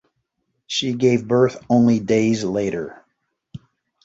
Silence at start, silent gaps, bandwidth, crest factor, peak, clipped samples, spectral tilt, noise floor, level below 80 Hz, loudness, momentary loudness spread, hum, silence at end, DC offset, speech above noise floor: 0.7 s; none; 8 kHz; 18 dB; -4 dBFS; under 0.1%; -6 dB/octave; -73 dBFS; -56 dBFS; -19 LUFS; 9 LU; none; 0.45 s; under 0.1%; 55 dB